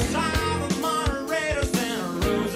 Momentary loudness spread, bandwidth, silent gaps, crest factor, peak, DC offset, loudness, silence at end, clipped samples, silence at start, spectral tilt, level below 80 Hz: 2 LU; 16 kHz; none; 16 dB; -10 dBFS; under 0.1%; -25 LUFS; 0 s; under 0.1%; 0 s; -4.5 dB/octave; -34 dBFS